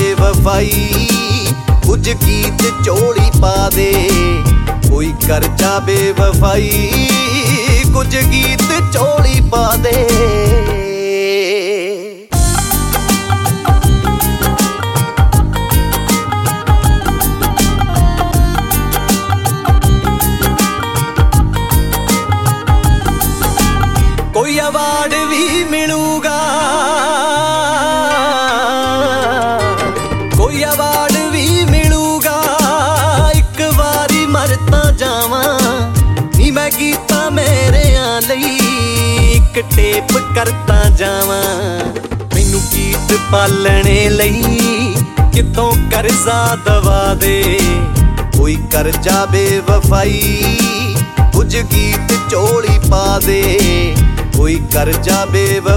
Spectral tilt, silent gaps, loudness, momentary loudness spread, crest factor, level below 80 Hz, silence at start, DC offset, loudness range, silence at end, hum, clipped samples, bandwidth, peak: -4.5 dB/octave; none; -12 LUFS; 3 LU; 12 dB; -16 dBFS; 0 s; 0.8%; 2 LU; 0 s; none; under 0.1%; 17 kHz; 0 dBFS